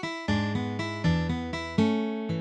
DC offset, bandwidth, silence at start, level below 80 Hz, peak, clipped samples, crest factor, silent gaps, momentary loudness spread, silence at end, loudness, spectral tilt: under 0.1%; 9.2 kHz; 0 s; -46 dBFS; -10 dBFS; under 0.1%; 18 dB; none; 5 LU; 0 s; -28 LUFS; -6.5 dB/octave